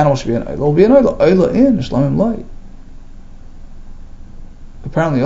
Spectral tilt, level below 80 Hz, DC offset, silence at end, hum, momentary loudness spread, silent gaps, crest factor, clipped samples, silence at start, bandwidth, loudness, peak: -8 dB/octave; -32 dBFS; under 0.1%; 0 s; none; 11 LU; none; 14 dB; under 0.1%; 0 s; 7.8 kHz; -13 LUFS; 0 dBFS